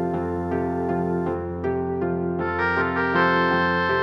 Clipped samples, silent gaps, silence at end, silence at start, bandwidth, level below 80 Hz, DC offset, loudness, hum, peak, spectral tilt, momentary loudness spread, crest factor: under 0.1%; none; 0 s; 0 s; 6 kHz; -48 dBFS; under 0.1%; -23 LUFS; none; -8 dBFS; -8 dB/octave; 7 LU; 16 dB